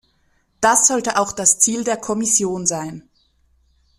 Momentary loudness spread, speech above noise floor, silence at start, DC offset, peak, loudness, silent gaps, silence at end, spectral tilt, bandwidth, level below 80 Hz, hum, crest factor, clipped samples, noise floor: 9 LU; 44 dB; 0.6 s; under 0.1%; 0 dBFS; -16 LUFS; none; 1 s; -2 dB/octave; 15.5 kHz; -56 dBFS; none; 20 dB; under 0.1%; -62 dBFS